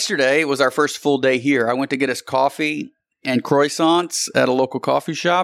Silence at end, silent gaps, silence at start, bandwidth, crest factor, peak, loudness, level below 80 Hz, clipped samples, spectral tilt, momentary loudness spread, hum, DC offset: 0 s; none; 0 s; 16 kHz; 14 dB; -4 dBFS; -18 LUFS; -72 dBFS; under 0.1%; -4 dB/octave; 6 LU; none; under 0.1%